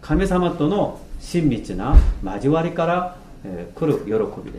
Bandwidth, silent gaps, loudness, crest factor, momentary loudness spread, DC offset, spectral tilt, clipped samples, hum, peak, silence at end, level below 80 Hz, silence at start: 12 kHz; none; -21 LUFS; 20 dB; 15 LU; under 0.1%; -7.5 dB/octave; under 0.1%; none; 0 dBFS; 0 s; -24 dBFS; 0 s